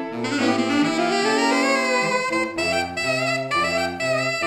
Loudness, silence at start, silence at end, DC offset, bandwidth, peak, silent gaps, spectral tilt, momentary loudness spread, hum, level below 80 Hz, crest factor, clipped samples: -21 LUFS; 0 s; 0 s; under 0.1%; 16.5 kHz; -8 dBFS; none; -3.5 dB/octave; 4 LU; none; -58 dBFS; 14 dB; under 0.1%